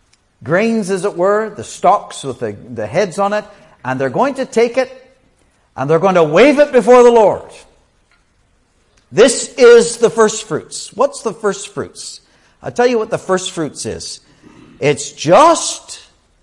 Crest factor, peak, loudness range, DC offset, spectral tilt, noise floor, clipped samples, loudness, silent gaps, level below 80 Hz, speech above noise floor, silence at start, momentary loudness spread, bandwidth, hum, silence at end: 14 dB; 0 dBFS; 7 LU; under 0.1%; -4 dB/octave; -57 dBFS; under 0.1%; -13 LUFS; none; -52 dBFS; 44 dB; 0.4 s; 18 LU; 11.5 kHz; none; 0.45 s